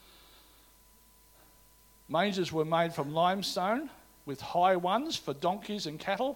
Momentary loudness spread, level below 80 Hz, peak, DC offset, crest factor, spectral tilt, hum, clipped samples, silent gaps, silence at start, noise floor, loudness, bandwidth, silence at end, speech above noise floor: 10 LU; -66 dBFS; -14 dBFS; under 0.1%; 18 dB; -5 dB/octave; none; under 0.1%; none; 2.1 s; -61 dBFS; -31 LUFS; 17.5 kHz; 0 s; 30 dB